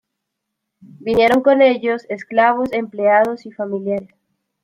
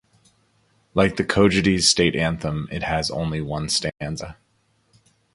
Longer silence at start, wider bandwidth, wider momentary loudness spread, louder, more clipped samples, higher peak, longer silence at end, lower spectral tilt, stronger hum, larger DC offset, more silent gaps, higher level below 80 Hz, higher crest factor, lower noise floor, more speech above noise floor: about the same, 1 s vs 0.95 s; first, 13.5 kHz vs 11.5 kHz; about the same, 12 LU vs 13 LU; first, -17 LUFS vs -21 LUFS; neither; about the same, -2 dBFS vs -2 dBFS; second, 0.6 s vs 1 s; first, -6 dB/octave vs -4 dB/octave; neither; neither; neither; second, -56 dBFS vs -42 dBFS; second, 16 dB vs 22 dB; first, -78 dBFS vs -65 dBFS; first, 62 dB vs 44 dB